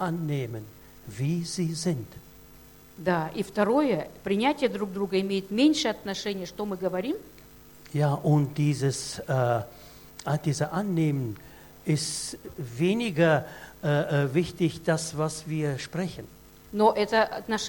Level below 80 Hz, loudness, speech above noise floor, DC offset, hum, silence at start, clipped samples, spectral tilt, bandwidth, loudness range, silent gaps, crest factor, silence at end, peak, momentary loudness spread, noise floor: -56 dBFS; -27 LUFS; 24 dB; under 0.1%; none; 0 s; under 0.1%; -5.5 dB/octave; 17.5 kHz; 3 LU; none; 20 dB; 0 s; -8 dBFS; 13 LU; -51 dBFS